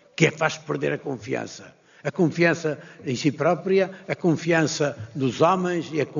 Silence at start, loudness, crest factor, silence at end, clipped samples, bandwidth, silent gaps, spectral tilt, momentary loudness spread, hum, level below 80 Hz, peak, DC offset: 0.2 s; -24 LUFS; 20 dB; 0 s; under 0.1%; 7.4 kHz; none; -5 dB/octave; 10 LU; none; -66 dBFS; -4 dBFS; under 0.1%